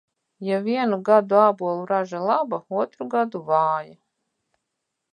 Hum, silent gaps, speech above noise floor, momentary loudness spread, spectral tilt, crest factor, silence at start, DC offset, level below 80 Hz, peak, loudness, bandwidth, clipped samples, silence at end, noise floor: none; none; 59 dB; 9 LU; -7.5 dB/octave; 20 dB; 0.4 s; under 0.1%; -80 dBFS; -4 dBFS; -22 LUFS; 9.6 kHz; under 0.1%; 1.2 s; -80 dBFS